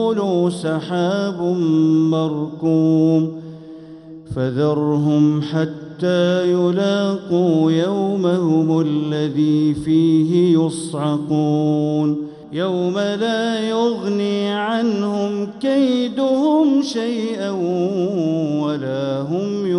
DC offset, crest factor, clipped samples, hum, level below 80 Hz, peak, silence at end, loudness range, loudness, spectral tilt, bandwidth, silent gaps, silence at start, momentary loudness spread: under 0.1%; 12 dB; under 0.1%; none; -58 dBFS; -6 dBFS; 0 s; 3 LU; -18 LUFS; -7 dB/octave; 11 kHz; none; 0 s; 7 LU